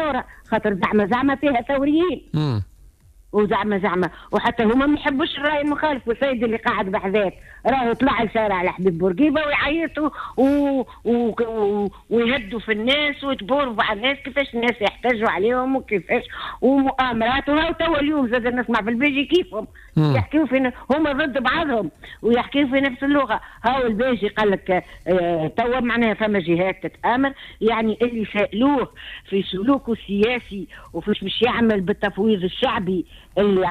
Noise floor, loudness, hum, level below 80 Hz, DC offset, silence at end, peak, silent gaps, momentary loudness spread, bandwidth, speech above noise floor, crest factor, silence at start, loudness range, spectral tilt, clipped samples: -49 dBFS; -21 LUFS; none; -44 dBFS; under 0.1%; 0 s; -8 dBFS; none; 6 LU; 11 kHz; 29 dB; 12 dB; 0 s; 1 LU; -7 dB/octave; under 0.1%